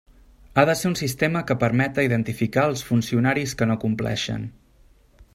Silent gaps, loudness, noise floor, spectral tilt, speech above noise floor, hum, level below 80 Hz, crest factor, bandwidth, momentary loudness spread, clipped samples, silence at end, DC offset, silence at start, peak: none; -22 LUFS; -55 dBFS; -5.5 dB/octave; 33 dB; none; -50 dBFS; 22 dB; 16 kHz; 5 LU; under 0.1%; 0.1 s; under 0.1%; 0.55 s; -2 dBFS